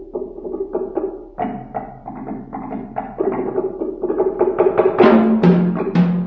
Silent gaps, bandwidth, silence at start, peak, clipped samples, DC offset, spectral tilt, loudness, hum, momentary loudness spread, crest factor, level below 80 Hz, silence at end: none; 5.6 kHz; 0 s; 0 dBFS; under 0.1%; under 0.1%; -10 dB/octave; -18 LUFS; none; 17 LU; 18 dB; -46 dBFS; 0 s